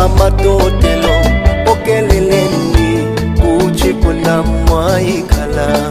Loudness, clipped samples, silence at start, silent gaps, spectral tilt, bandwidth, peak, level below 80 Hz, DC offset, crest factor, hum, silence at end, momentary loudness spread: -12 LUFS; 0.2%; 0 s; none; -6 dB/octave; 15.5 kHz; 0 dBFS; -16 dBFS; under 0.1%; 10 dB; none; 0 s; 3 LU